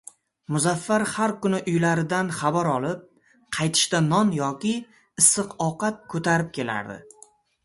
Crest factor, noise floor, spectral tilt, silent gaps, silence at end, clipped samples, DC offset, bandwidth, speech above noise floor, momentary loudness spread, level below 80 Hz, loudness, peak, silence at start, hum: 22 dB; -55 dBFS; -4 dB/octave; none; 0.65 s; under 0.1%; under 0.1%; 12 kHz; 31 dB; 12 LU; -62 dBFS; -23 LUFS; -4 dBFS; 0.5 s; none